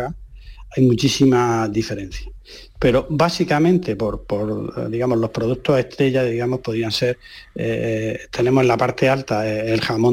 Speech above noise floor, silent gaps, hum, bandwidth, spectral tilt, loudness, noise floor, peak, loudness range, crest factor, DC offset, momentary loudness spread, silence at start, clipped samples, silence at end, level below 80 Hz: 19 dB; none; none; 16 kHz; -6 dB/octave; -19 LUFS; -38 dBFS; -4 dBFS; 2 LU; 16 dB; under 0.1%; 13 LU; 0 s; under 0.1%; 0 s; -42 dBFS